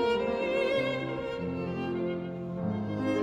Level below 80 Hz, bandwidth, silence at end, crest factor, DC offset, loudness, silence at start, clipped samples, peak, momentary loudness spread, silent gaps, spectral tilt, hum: -58 dBFS; 9.8 kHz; 0 s; 12 dB; under 0.1%; -31 LUFS; 0 s; under 0.1%; -18 dBFS; 6 LU; none; -7 dB/octave; none